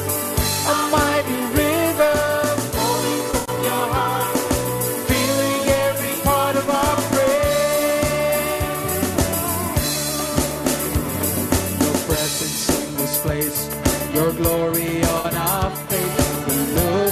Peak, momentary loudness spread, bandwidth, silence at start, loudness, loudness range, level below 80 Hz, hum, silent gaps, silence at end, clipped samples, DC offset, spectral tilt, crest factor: -6 dBFS; 3 LU; 15 kHz; 0 s; -20 LUFS; 2 LU; -34 dBFS; none; none; 0 s; under 0.1%; under 0.1%; -4 dB/octave; 14 dB